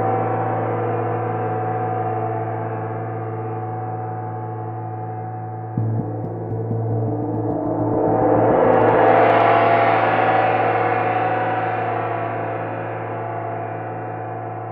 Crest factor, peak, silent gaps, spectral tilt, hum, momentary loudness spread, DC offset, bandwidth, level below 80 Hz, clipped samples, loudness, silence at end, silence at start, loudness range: 18 dB; -2 dBFS; none; -10.5 dB/octave; none; 14 LU; under 0.1%; 5 kHz; -52 dBFS; under 0.1%; -21 LUFS; 0 s; 0 s; 11 LU